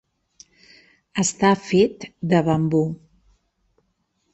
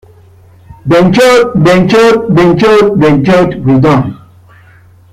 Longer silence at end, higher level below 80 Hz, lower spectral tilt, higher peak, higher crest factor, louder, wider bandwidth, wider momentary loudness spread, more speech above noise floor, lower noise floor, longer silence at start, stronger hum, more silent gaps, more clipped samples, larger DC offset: first, 1.4 s vs 1 s; second, -56 dBFS vs -36 dBFS; about the same, -5.5 dB/octave vs -6.5 dB/octave; second, -4 dBFS vs 0 dBFS; first, 18 dB vs 8 dB; second, -21 LUFS vs -7 LUFS; second, 8.6 kHz vs 15.5 kHz; first, 12 LU vs 4 LU; first, 51 dB vs 33 dB; first, -70 dBFS vs -39 dBFS; first, 1.15 s vs 0.7 s; neither; neither; neither; neither